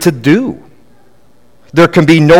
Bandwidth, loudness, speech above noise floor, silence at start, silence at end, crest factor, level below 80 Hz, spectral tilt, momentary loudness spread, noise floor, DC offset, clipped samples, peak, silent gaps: 16.5 kHz; -10 LUFS; 42 dB; 0 s; 0 s; 10 dB; -42 dBFS; -6.5 dB/octave; 14 LU; -49 dBFS; under 0.1%; 2%; 0 dBFS; none